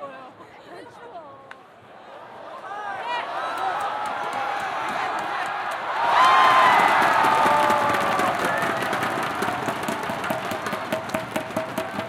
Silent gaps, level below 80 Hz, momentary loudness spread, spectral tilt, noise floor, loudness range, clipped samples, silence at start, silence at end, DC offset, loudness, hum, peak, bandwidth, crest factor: none; -62 dBFS; 24 LU; -3.5 dB/octave; -46 dBFS; 13 LU; under 0.1%; 0 s; 0 s; under 0.1%; -22 LUFS; none; -6 dBFS; 17 kHz; 18 dB